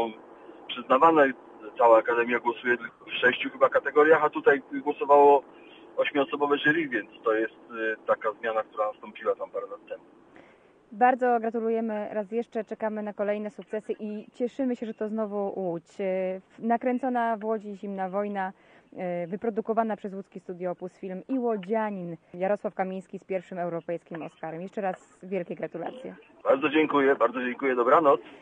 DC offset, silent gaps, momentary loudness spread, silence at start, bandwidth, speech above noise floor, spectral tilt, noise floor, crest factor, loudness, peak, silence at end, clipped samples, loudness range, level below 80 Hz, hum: under 0.1%; none; 17 LU; 0 s; 8 kHz; 31 dB; -7 dB/octave; -57 dBFS; 20 dB; -27 LUFS; -6 dBFS; 0.05 s; under 0.1%; 9 LU; -76 dBFS; none